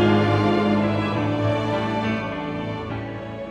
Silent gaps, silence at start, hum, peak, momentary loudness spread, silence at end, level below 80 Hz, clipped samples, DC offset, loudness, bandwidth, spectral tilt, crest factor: none; 0 s; none; -8 dBFS; 11 LU; 0 s; -48 dBFS; under 0.1%; under 0.1%; -23 LUFS; 8.8 kHz; -7.5 dB/octave; 14 dB